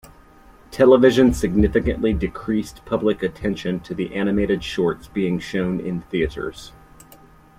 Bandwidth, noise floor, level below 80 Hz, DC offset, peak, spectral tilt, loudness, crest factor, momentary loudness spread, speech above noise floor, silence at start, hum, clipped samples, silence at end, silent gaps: 15 kHz; -48 dBFS; -36 dBFS; under 0.1%; -2 dBFS; -6.5 dB/octave; -20 LUFS; 18 dB; 12 LU; 28 dB; 0.7 s; none; under 0.1%; 0.9 s; none